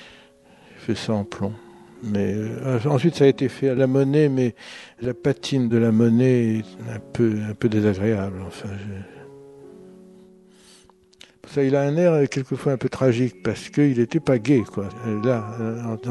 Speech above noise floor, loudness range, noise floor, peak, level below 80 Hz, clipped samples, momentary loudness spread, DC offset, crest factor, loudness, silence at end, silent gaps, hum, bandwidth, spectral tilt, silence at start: 32 dB; 7 LU; -53 dBFS; -4 dBFS; -60 dBFS; under 0.1%; 15 LU; under 0.1%; 18 dB; -22 LUFS; 0 s; none; none; 12 kHz; -7.5 dB/octave; 0 s